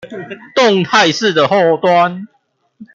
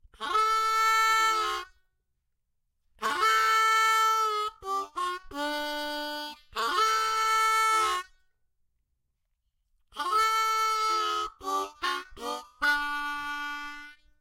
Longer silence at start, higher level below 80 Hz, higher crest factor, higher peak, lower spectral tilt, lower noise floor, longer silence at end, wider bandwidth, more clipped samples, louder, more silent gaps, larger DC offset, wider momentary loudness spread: second, 0.05 s vs 0.2 s; about the same, -60 dBFS vs -62 dBFS; about the same, 12 dB vs 14 dB; first, -2 dBFS vs -14 dBFS; first, -4.5 dB/octave vs 0.5 dB/octave; second, -41 dBFS vs -78 dBFS; second, 0.1 s vs 0.3 s; second, 7.6 kHz vs 16.5 kHz; neither; first, -12 LUFS vs -27 LUFS; neither; neither; first, 17 LU vs 13 LU